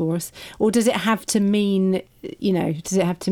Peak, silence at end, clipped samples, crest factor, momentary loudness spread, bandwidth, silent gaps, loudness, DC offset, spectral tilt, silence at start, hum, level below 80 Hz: -8 dBFS; 0 s; under 0.1%; 14 dB; 8 LU; 18 kHz; none; -21 LUFS; under 0.1%; -5.5 dB/octave; 0 s; none; -56 dBFS